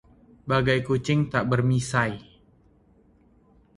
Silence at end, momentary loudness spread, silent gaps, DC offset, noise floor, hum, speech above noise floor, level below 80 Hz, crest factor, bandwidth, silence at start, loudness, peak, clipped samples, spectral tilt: 1.55 s; 7 LU; none; under 0.1%; -59 dBFS; none; 36 dB; -52 dBFS; 20 dB; 11.5 kHz; 0.45 s; -24 LUFS; -6 dBFS; under 0.1%; -6 dB/octave